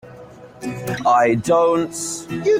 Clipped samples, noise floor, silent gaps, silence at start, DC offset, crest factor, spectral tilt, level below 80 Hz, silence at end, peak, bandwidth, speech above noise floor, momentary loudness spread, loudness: under 0.1%; -40 dBFS; none; 0.05 s; under 0.1%; 14 dB; -5 dB/octave; -54 dBFS; 0 s; -4 dBFS; 16.5 kHz; 22 dB; 13 LU; -18 LUFS